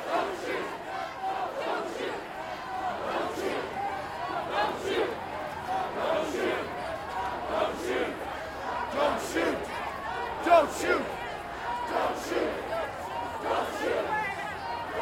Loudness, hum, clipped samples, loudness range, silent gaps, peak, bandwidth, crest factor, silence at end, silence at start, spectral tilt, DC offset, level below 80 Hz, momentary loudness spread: -31 LUFS; none; under 0.1%; 5 LU; none; -10 dBFS; 16 kHz; 20 dB; 0 s; 0 s; -4 dB/octave; under 0.1%; -56 dBFS; 7 LU